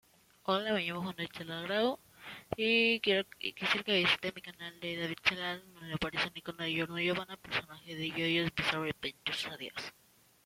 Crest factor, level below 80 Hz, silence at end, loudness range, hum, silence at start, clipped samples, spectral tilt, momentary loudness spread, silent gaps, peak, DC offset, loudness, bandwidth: 22 dB; -66 dBFS; 0.55 s; 4 LU; none; 0.45 s; under 0.1%; -4.5 dB/octave; 15 LU; none; -12 dBFS; under 0.1%; -33 LUFS; 16.5 kHz